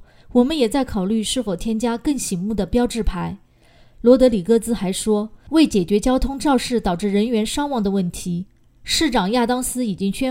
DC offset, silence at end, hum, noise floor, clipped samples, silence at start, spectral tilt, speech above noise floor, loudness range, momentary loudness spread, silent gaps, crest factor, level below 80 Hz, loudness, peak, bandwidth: under 0.1%; 0 s; none; -51 dBFS; under 0.1%; 0 s; -5 dB/octave; 32 dB; 3 LU; 8 LU; none; 18 dB; -34 dBFS; -20 LUFS; 0 dBFS; 16 kHz